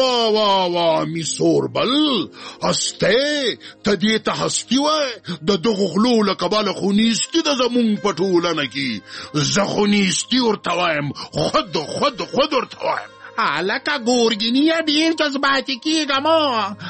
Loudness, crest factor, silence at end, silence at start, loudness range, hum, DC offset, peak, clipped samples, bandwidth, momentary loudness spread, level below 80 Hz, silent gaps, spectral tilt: -18 LUFS; 14 dB; 0 s; 0 s; 2 LU; none; under 0.1%; -4 dBFS; under 0.1%; 8.8 kHz; 7 LU; -54 dBFS; none; -3.5 dB/octave